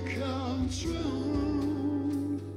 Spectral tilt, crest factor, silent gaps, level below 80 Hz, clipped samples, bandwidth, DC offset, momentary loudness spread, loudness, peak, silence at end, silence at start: -6 dB/octave; 12 dB; none; -44 dBFS; under 0.1%; 13 kHz; under 0.1%; 2 LU; -32 LUFS; -20 dBFS; 0 s; 0 s